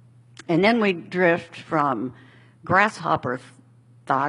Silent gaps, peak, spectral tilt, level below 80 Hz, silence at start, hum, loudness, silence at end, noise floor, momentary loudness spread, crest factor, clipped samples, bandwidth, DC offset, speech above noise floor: none; -2 dBFS; -6.5 dB/octave; -64 dBFS; 0.5 s; none; -22 LUFS; 0 s; -52 dBFS; 14 LU; 22 dB; under 0.1%; 11.5 kHz; under 0.1%; 31 dB